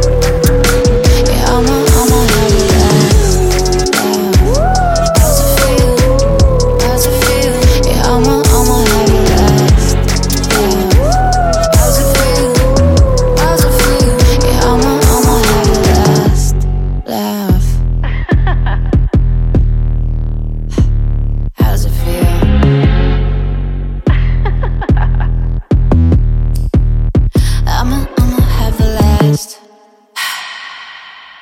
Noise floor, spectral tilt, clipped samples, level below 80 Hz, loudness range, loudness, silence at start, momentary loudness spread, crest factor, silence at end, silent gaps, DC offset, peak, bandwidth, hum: -44 dBFS; -5 dB/octave; under 0.1%; -14 dBFS; 4 LU; -11 LUFS; 0 s; 8 LU; 10 dB; 0.2 s; none; under 0.1%; 0 dBFS; 17 kHz; none